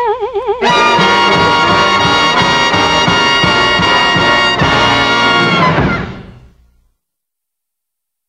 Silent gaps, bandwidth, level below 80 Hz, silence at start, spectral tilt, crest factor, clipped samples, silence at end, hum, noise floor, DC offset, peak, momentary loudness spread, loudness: none; 11.5 kHz; -34 dBFS; 0 s; -4 dB/octave; 12 dB; under 0.1%; 2 s; none; -79 dBFS; under 0.1%; 0 dBFS; 5 LU; -9 LUFS